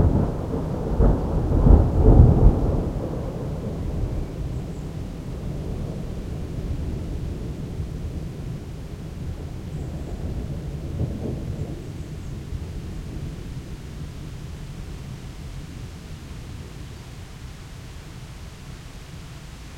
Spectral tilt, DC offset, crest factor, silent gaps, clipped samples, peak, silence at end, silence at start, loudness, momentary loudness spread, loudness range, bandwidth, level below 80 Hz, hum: -8.5 dB/octave; under 0.1%; 24 dB; none; under 0.1%; -2 dBFS; 0 s; 0 s; -26 LUFS; 20 LU; 18 LU; 11 kHz; -28 dBFS; none